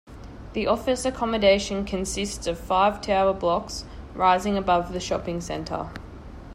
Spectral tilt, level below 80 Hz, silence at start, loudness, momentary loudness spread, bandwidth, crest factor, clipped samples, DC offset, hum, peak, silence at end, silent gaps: -4.5 dB/octave; -42 dBFS; 0.05 s; -24 LUFS; 16 LU; 15.5 kHz; 18 dB; under 0.1%; under 0.1%; none; -8 dBFS; 0 s; none